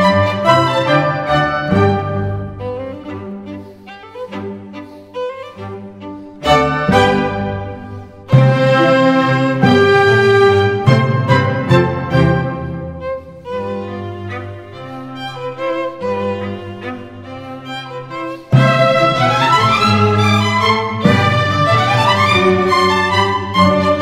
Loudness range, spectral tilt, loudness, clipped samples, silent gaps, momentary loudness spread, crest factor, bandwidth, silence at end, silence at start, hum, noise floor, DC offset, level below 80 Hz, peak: 13 LU; -6.5 dB/octave; -13 LUFS; under 0.1%; none; 18 LU; 14 dB; 13.5 kHz; 0 s; 0 s; none; -35 dBFS; under 0.1%; -42 dBFS; 0 dBFS